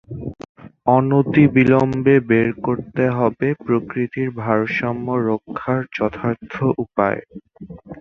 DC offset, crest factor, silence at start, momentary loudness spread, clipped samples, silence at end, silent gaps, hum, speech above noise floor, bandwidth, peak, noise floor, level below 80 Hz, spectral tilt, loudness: under 0.1%; 18 dB; 0.1 s; 13 LU; under 0.1%; 0.05 s; 0.49-0.55 s; none; 19 dB; 6.6 kHz; 0 dBFS; -37 dBFS; -50 dBFS; -9.5 dB/octave; -19 LUFS